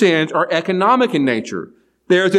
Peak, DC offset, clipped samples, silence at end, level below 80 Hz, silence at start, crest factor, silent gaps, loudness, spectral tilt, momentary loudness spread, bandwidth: -2 dBFS; under 0.1%; under 0.1%; 0 s; -70 dBFS; 0 s; 14 dB; none; -16 LUFS; -5.5 dB/octave; 14 LU; 11.5 kHz